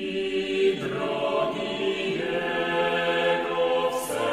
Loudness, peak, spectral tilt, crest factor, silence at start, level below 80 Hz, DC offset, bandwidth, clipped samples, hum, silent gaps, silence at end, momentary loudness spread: -25 LUFS; -12 dBFS; -4 dB/octave; 14 dB; 0 s; -58 dBFS; under 0.1%; 15.5 kHz; under 0.1%; none; none; 0 s; 4 LU